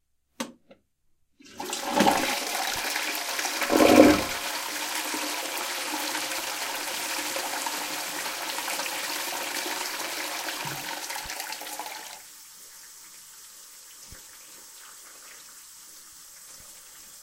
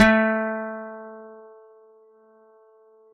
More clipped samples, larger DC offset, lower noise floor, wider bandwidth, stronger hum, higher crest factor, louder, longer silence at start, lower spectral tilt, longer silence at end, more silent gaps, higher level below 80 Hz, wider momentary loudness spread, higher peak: neither; neither; first, -67 dBFS vs -55 dBFS; first, 17 kHz vs 6.2 kHz; neither; first, 28 dB vs 22 dB; about the same, -26 LUFS vs -24 LUFS; first, 0.4 s vs 0 s; second, -2 dB/octave vs -4 dB/octave; second, 0 s vs 1.75 s; neither; second, -58 dBFS vs -52 dBFS; second, 22 LU vs 25 LU; first, 0 dBFS vs -4 dBFS